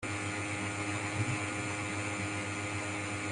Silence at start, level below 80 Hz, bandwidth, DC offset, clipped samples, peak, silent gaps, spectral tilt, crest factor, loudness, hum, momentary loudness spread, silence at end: 0 s; -64 dBFS; 11.5 kHz; under 0.1%; under 0.1%; -22 dBFS; none; -4 dB/octave; 14 dB; -35 LUFS; none; 2 LU; 0 s